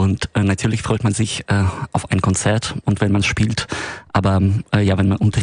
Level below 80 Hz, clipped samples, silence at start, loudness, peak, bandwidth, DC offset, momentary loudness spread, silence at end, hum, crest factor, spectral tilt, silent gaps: -38 dBFS; under 0.1%; 0 s; -18 LUFS; -2 dBFS; 10.5 kHz; under 0.1%; 5 LU; 0 s; none; 16 dB; -5.5 dB/octave; none